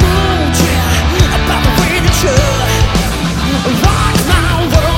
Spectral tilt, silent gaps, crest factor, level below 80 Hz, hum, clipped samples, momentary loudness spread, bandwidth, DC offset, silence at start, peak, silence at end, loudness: -4.5 dB/octave; none; 10 dB; -16 dBFS; none; 0.2%; 3 LU; 17 kHz; under 0.1%; 0 s; 0 dBFS; 0 s; -11 LUFS